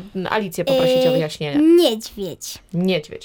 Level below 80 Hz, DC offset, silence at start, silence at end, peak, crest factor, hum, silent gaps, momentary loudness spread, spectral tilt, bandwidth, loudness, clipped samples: -52 dBFS; under 0.1%; 0 s; 0 s; -4 dBFS; 14 dB; none; none; 15 LU; -5.5 dB/octave; 18 kHz; -18 LUFS; under 0.1%